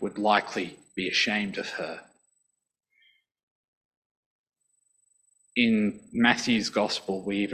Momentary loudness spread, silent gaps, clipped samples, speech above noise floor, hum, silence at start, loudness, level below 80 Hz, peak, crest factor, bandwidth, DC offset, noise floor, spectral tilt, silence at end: 11 LU; 3.43-3.91 s, 3.97-4.44 s; under 0.1%; 49 dB; none; 0 s; -26 LUFS; -66 dBFS; -4 dBFS; 24 dB; 10.5 kHz; under 0.1%; -76 dBFS; -4 dB/octave; 0 s